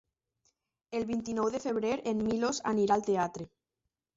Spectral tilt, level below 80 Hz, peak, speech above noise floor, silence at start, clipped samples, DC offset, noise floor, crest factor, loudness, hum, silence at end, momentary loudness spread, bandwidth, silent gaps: -5 dB/octave; -64 dBFS; -14 dBFS; 56 dB; 0.9 s; under 0.1%; under 0.1%; -87 dBFS; 18 dB; -31 LUFS; none; 0.7 s; 9 LU; 8 kHz; none